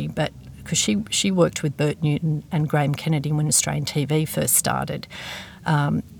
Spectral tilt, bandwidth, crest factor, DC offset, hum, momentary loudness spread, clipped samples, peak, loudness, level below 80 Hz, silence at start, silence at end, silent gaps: -4.5 dB/octave; over 20 kHz; 18 dB; under 0.1%; none; 11 LU; under 0.1%; -6 dBFS; -22 LUFS; -52 dBFS; 0 s; 0 s; none